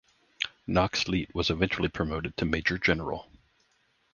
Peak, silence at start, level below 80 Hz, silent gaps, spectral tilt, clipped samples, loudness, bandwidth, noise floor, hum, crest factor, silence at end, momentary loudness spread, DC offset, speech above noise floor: -8 dBFS; 0.4 s; -46 dBFS; none; -5 dB/octave; under 0.1%; -29 LUFS; 7.4 kHz; -70 dBFS; none; 22 dB; 0.9 s; 9 LU; under 0.1%; 41 dB